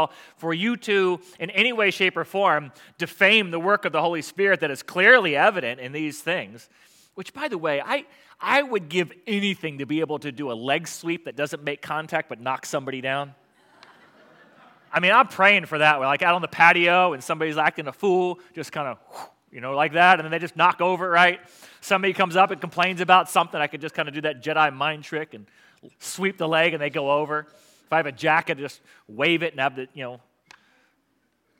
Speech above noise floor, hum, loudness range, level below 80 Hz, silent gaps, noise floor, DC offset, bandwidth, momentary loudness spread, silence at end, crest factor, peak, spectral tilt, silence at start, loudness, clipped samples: 47 dB; none; 9 LU; -80 dBFS; none; -69 dBFS; under 0.1%; 17 kHz; 15 LU; 1.45 s; 22 dB; -2 dBFS; -4 dB/octave; 0 s; -22 LUFS; under 0.1%